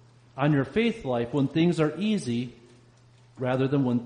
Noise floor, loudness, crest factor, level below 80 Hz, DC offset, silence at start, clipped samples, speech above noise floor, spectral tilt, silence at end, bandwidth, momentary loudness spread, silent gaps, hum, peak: -56 dBFS; -26 LUFS; 14 dB; -60 dBFS; under 0.1%; 0.35 s; under 0.1%; 31 dB; -7.5 dB/octave; 0 s; 10 kHz; 8 LU; none; none; -12 dBFS